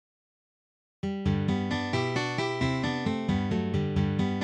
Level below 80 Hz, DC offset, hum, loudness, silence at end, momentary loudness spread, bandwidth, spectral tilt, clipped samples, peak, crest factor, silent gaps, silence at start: -48 dBFS; under 0.1%; none; -29 LUFS; 0 s; 2 LU; 9.6 kHz; -6.5 dB/octave; under 0.1%; -14 dBFS; 14 dB; none; 1.05 s